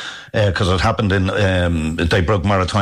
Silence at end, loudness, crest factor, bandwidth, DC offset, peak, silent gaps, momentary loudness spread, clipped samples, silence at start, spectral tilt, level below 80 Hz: 0 s; -17 LUFS; 10 dB; 11 kHz; under 0.1%; -8 dBFS; none; 3 LU; under 0.1%; 0 s; -6 dB/octave; -32 dBFS